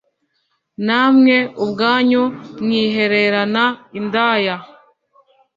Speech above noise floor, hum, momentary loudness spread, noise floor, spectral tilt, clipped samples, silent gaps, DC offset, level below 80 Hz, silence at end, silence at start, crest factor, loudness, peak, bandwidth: 52 dB; none; 11 LU; -68 dBFS; -6.5 dB/octave; under 0.1%; none; under 0.1%; -62 dBFS; 0.9 s; 0.8 s; 16 dB; -16 LUFS; -2 dBFS; 7.4 kHz